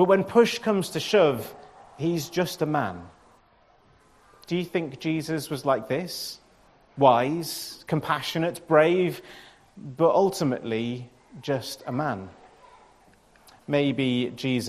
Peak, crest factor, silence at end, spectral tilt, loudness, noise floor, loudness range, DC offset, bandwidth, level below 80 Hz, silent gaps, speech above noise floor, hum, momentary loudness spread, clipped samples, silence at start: -4 dBFS; 22 dB; 0 s; -5.5 dB/octave; -25 LUFS; -60 dBFS; 7 LU; under 0.1%; 14 kHz; -64 dBFS; none; 35 dB; none; 18 LU; under 0.1%; 0 s